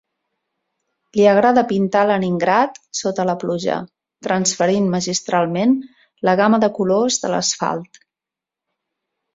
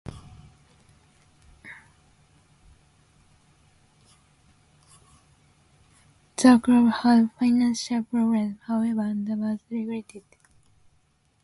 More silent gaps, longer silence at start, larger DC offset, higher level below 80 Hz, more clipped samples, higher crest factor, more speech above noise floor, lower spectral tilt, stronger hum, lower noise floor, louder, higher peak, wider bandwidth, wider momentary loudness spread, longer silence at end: neither; first, 1.15 s vs 0.05 s; neither; about the same, -60 dBFS vs -60 dBFS; neither; about the same, 18 dB vs 22 dB; first, 70 dB vs 44 dB; about the same, -4.5 dB/octave vs -5 dB/octave; neither; first, -87 dBFS vs -65 dBFS; first, -18 LUFS vs -23 LUFS; about the same, -2 dBFS vs -4 dBFS; second, 7.8 kHz vs 11.5 kHz; second, 9 LU vs 23 LU; first, 1.5 s vs 1.25 s